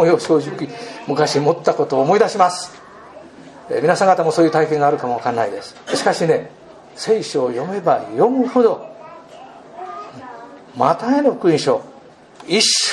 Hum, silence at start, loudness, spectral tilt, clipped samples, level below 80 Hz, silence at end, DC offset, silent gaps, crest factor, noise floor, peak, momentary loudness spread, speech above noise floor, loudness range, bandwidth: none; 0 s; -17 LUFS; -4 dB/octave; under 0.1%; -66 dBFS; 0 s; under 0.1%; none; 18 dB; -42 dBFS; 0 dBFS; 19 LU; 26 dB; 3 LU; 12 kHz